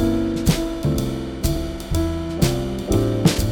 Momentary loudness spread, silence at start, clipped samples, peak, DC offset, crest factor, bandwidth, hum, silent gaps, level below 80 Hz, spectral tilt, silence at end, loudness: 6 LU; 0 s; under 0.1%; -4 dBFS; under 0.1%; 16 dB; over 20 kHz; none; none; -30 dBFS; -6 dB/octave; 0 s; -22 LUFS